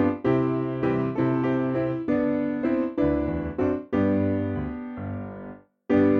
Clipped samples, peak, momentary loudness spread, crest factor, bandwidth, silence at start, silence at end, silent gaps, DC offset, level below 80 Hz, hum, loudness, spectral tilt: under 0.1%; -10 dBFS; 11 LU; 14 dB; 5 kHz; 0 s; 0 s; none; under 0.1%; -46 dBFS; none; -25 LUFS; -10 dB/octave